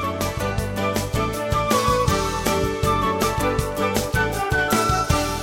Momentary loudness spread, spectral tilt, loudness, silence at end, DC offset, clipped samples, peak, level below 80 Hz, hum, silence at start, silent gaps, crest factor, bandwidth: 5 LU; -4.5 dB/octave; -21 LUFS; 0 s; under 0.1%; under 0.1%; -4 dBFS; -32 dBFS; none; 0 s; none; 18 dB; 17 kHz